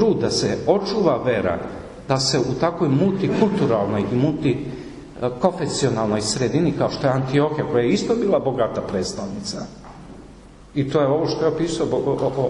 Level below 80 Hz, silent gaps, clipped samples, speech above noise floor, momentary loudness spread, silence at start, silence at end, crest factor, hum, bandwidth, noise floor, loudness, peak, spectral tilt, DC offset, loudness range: -46 dBFS; none; under 0.1%; 23 dB; 11 LU; 0 s; 0 s; 18 dB; none; 11 kHz; -43 dBFS; -21 LUFS; -4 dBFS; -5.5 dB/octave; under 0.1%; 4 LU